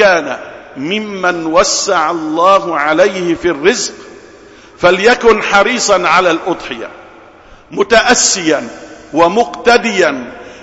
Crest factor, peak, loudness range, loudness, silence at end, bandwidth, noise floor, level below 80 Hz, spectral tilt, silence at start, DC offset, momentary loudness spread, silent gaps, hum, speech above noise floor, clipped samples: 12 dB; 0 dBFS; 2 LU; -11 LUFS; 0 s; 8.2 kHz; -39 dBFS; -44 dBFS; -2.5 dB/octave; 0 s; under 0.1%; 15 LU; none; none; 27 dB; under 0.1%